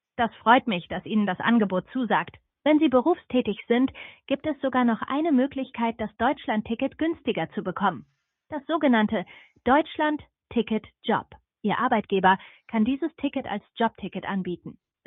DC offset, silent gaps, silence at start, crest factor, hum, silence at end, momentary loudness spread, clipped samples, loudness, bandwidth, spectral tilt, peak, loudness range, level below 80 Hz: under 0.1%; none; 0.2 s; 20 dB; none; 0.35 s; 10 LU; under 0.1%; -25 LUFS; 4 kHz; -9.5 dB/octave; -4 dBFS; 3 LU; -58 dBFS